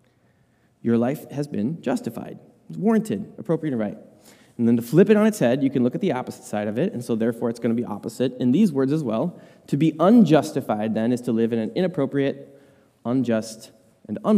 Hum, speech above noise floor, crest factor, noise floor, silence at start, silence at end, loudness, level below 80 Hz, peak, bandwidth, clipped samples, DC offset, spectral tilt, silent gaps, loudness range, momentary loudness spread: none; 40 dB; 18 dB; -62 dBFS; 0.85 s; 0 s; -22 LUFS; -68 dBFS; -4 dBFS; 15.5 kHz; under 0.1%; under 0.1%; -7.5 dB/octave; none; 5 LU; 13 LU